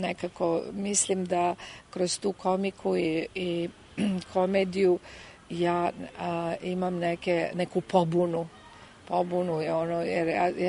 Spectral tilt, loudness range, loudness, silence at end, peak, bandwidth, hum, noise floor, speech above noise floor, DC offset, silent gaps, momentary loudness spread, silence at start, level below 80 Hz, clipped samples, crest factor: -5 dB/octave; 1 LU; -28 LUFS; 0 s; -8 dBFS; 11 kHz; none; -50 dBFS; 22 dB; under 0.1%; none; 8 LU; 0 s; -62 dBFS; under 0.1%; 20 dB